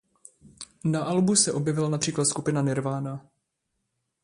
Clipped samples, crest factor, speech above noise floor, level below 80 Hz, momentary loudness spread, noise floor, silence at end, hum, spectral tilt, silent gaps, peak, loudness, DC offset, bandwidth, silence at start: under 0.1%; 22 dB; 54 dB; -64 dBFS; 16 LU; -79 dBFS; 1.05 s; none; -4.5 dB/octave; none; -6 dBFS; -25 LUFS; under 0.1%; 11.5 kHz; 0.45 s